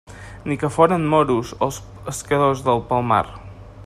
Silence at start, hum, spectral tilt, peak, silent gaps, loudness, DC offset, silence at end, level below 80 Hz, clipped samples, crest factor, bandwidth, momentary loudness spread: 0.1 s; none; -6 dB/octave; -2 dBFS; none; -20 LUFS; under 0.1%; 0 s; -44 dBFS; under 0.1%; 20 dB; 14.5 kHz; 15 LU